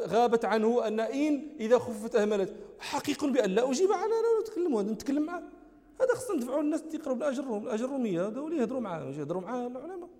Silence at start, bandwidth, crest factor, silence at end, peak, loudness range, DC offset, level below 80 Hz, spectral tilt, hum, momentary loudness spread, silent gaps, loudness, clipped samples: 0 s; 16 kHz; 18 dB; 0.05 s; -12 dBFS; 4 LU; under 0.1%; -68 dBFS; -5.5 dB/octave; none; 9 LU; none; -30 LUFS; under 0.1%